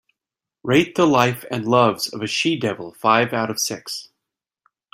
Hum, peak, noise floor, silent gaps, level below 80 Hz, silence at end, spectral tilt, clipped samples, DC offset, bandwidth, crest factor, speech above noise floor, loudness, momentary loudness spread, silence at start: none; -2 dBFS; -87 dBFS; none; -60 dBFS; 0.9 s; -4.5 dB/octave; under 0.1%; under 0.1%; 16 kHz; 20 dB; 68 dB; -19 LUFS; 11 LU; 0.65 s